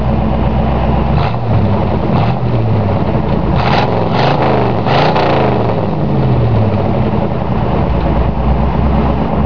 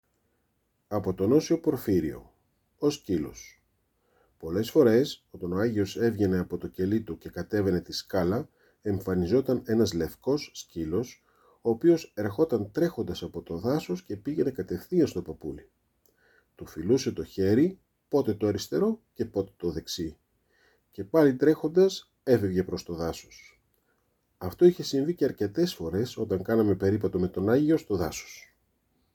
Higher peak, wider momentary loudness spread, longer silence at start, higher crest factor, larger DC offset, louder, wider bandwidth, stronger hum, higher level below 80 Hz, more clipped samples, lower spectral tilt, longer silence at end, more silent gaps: first, -2 dBFS vs -8 dBFS; second, 3 LU vs 14 LU; second, 0 s vs 0.9 s; second, 12 dB vs 20 dB; first, 9% vs under 0.1%; first, -13 LUFS vs -28 LUFS; second, 5.4 kHz vs 19.5 kHz; neither; first, -20 dBFS vs -58 dBFS; neither; first, -9 dB/octave vs -6.5 dB/octave; second, 0 s vs 0.75 s; neither